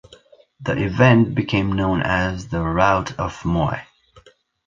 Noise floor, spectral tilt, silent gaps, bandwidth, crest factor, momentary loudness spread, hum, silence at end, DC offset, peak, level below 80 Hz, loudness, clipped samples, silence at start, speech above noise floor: -52 dBFS; -7 dB/octave; none; 7.6 kHz; 18 dB; 11 LU; none; 0.8 s; under 0.1%; -2 dBFS; -38 dBFS; -19 LUFS; under 0.1%; 0.6 s; 33 dB